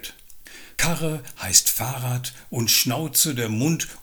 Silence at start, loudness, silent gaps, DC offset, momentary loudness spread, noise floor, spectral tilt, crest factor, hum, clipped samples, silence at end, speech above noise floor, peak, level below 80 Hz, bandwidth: 0 s; -21 LUFS; none; under 0.1%; 14 LU; -43 dBFS; -2.5 dB/octave; 24 dB; none; under 0.1%; 0 s; 20 dB; 0 dBFS; -48 dBFS; over 20 kHz